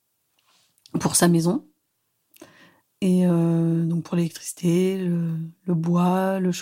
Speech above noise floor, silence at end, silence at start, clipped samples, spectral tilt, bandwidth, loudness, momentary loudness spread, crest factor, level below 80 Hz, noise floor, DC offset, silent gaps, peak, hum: 52 dB; 0 s; 0.95 s; under 0.1%; -6 dB/octave; 16 kHz; -22 LUFS; 9 LU; 20 dB; -64 dBFS; -73 dBFS; under 0.1%; none; -4 dBFS; none